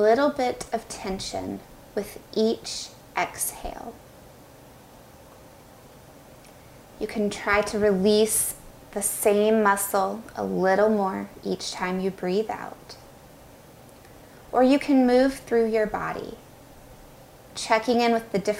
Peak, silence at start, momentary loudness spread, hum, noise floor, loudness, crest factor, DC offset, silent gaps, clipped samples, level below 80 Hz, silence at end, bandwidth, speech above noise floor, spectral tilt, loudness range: -6 dBFS; 0 s; 16 LU; none; -49 dBFS; -24 LUFS; 20 dB; under 0.1%; none; under 0.1%; -54 dBFS; 0 s; 16 kHz; 25 dB; -4 dB/octave; 11 LU